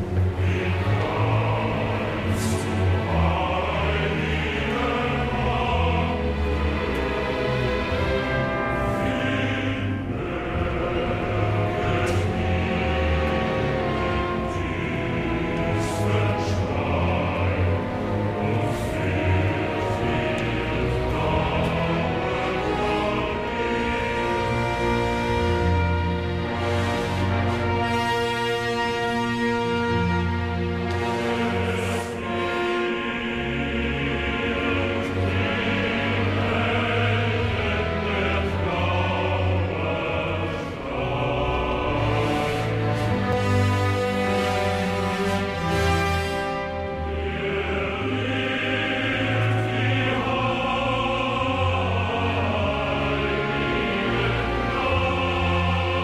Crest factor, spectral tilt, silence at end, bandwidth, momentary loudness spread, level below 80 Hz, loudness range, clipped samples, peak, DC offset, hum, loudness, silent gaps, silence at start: 14 dB; -6.5 dB/octave; 0 s; 13.5 kHz; 3 LU; -36 dBFS; 2 LU; under 0.1%; -10 dBFS; under 0.1%; none; -24 LUFS; none; 0 s